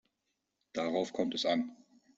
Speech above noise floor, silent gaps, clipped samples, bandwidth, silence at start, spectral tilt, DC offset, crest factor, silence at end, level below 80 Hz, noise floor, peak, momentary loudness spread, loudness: 51 dB; none; under 0.1%; 8 kHz; 0.75 s; -4.5 dB/octave; under 0.1%; 18 dB; 0.45 s; -76 dBFS; -84 dBFS; -18 dBFS; 10 LU; -34 LUFS